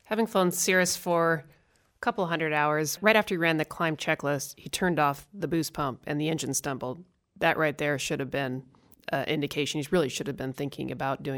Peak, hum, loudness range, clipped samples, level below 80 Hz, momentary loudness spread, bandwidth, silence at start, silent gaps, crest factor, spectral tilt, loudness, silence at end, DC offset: -8 dBFS; none; 4 LU; under 0.1%; -60 dBFS; 11 LU; 19.5 kHz; 0.1 s; none; 20 dB; -4 dB/octave; -28 LUFS; 0 s; under 0.1%